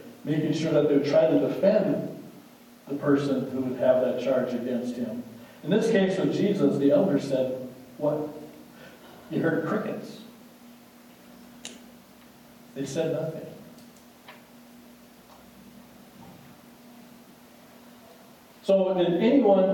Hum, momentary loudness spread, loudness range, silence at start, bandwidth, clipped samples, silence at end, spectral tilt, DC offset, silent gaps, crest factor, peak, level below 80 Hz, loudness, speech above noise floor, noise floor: none; 22 LU; 11 LU; 0 s; 17.5 kHz; under 0.1%; 0 s; -7 dB/octave; under 0.1%; none; 18 dB; -10 dBFS; -70 dBFS; -25 LUFS; 28 dB; -52 dBFS